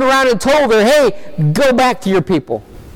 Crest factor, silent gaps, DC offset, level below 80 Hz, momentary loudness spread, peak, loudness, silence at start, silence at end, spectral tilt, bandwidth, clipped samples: 8 dB; none; under 0.1%; -40 dBFS; 8 LU; -6 dBFS; -12 LUFS; 0 s; 0.05 s; -5 dB/octave; 18 kHz; under 0.1%